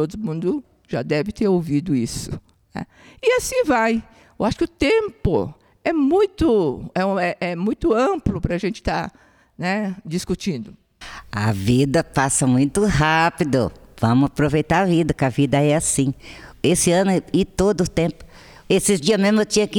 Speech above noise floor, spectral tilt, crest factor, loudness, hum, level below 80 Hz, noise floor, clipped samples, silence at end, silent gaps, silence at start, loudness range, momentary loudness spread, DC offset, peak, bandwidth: 20 dB; -5 dB/octave; 16 dB; -20 LUFS; none; -40 dBFS; -39 dBFS; under 0.1%; 0 s; none; 0 s; 5 LU; 12 LU; under 0.1%; -4 dBFS; 19.5 kHz